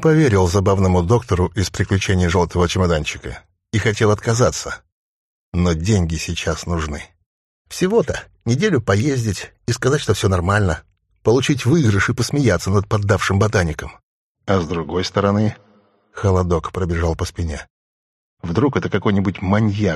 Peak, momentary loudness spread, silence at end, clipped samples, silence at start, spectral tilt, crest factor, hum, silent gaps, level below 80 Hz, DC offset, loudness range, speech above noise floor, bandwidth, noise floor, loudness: -2 dBFS; 11 LU; 0 s; under 0.1%; 0 s; -6 dB/octave; 16 dB; none; 4.92-5.52 s, 7.26-7.65 s, 14.03-14.35 s, 17.70-18.37 s; -36 dBFS; under 0.1%; 4 LU; 38 dB; 13 kHz; -55 dBFS; -18 LUFS